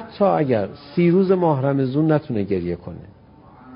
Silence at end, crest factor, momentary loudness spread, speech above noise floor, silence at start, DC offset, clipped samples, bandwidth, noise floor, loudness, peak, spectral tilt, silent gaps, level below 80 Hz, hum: 0 s; 16 dB; 12 LU; 27 dB; 0 s; under 0.1%; under 0.1%; 5.4 kHz; -47 dBFS; -20 LUFS; -4 dBFS; -13 dB/octave; none; -50 dBFS; none